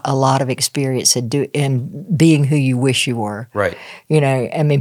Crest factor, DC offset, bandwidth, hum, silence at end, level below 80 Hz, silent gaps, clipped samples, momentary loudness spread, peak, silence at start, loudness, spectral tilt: 16 dB; under 0.1%; 16 kHz; none; 0 s; -64 dBFS; none; under 0.1%; 9 LU; 0 dBFS; 0.05 s; -16 LUFS; -5 dB/octave